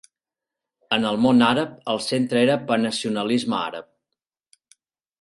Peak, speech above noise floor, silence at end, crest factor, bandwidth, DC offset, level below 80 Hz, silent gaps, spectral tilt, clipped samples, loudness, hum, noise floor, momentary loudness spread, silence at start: -4 dBFS; 67 dB; 1.4 s; 18 dB; 11.5 kHz; under 0.1%; -64 dBFS; none; -5 dB/octave; under 0.1%; -21 LUFS; none; -88 dBFS; 9 LU; 0.9 s